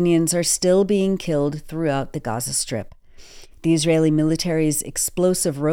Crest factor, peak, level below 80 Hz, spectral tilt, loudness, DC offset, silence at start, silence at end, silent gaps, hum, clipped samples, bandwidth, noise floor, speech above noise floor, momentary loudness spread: 14 dB; -6 dBFS; -44 dBFS; -5 dB/octave; -20 LUFS; under 0.1%; 0 s; 0 s; none; none; under 0.1%; 17.5 kHz; -42 dBFS; 22 dB; 8 LU